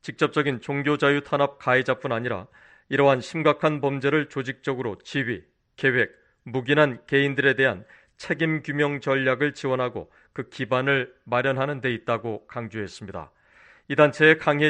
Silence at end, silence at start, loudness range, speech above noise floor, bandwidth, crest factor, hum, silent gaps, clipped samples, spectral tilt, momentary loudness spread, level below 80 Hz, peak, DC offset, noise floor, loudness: 0 s; 0.05 s; 4 LU; 31 dB; 9.4 kHz; 20 dB; none; none; under 0.1%; -6.5 dB/octave; 13 LU; -64 dBFS; -4 dBFS; under 0.1%; -55 dBFS; -24 LUFS